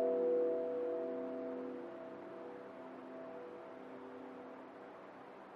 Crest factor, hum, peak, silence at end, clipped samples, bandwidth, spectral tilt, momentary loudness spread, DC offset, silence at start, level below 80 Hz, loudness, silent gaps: 16 dB; none; -26 dBFS; 0 s; under 0.1%; 5.4 kHz; -7.5 dB/octave; 18 LU; under 0.1%; 0 s; under -90 dBFS; -43 LUFS; none